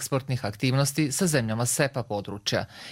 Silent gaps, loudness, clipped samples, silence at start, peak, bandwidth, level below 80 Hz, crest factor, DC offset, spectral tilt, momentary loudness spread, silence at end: none; -26 LUFS; under 0.1%; 0 s; -6 dBFS; 16.5 kHz; -56 dBFS; 20 dB; under 0.1%; -4.5 dB/octave; 7 LU; 0 s